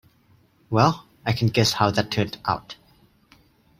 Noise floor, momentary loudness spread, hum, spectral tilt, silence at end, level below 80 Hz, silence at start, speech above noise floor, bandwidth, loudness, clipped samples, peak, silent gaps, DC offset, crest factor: -59 dBFS; 10 LU; none; -5 dB/octave; 1.05 s; -54 dBFS; 0.7 s; 37 dB; 16 kHz; -23 LUFS; under 0.1%; -2 dBFS; none; under 0.1%; 22 dB